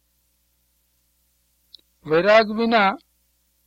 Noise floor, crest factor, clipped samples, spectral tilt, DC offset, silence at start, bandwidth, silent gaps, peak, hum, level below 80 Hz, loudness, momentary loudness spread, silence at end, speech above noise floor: -67 dBFS; 22 dB; under 0.1%; -6 dB/octave; under 0.1%; 2.05 s; 7.6 kHz; none; -2 dBFS; 60 Hz at -55 dBFS; -60 dBFS; -18 LUFS; 18 LU; 0.7 s; 49 dB